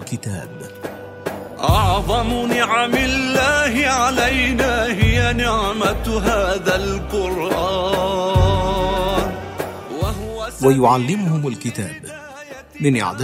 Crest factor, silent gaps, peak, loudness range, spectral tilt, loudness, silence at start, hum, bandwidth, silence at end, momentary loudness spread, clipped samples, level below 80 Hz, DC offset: 18 dB; none; -2 dBFS; 4 LU; -5 dB/octave; -18 LUFS; 0 s; none; 16 kHz; 0 s; 14 LU; under 0.1%; -30 dBFS; under 0.1%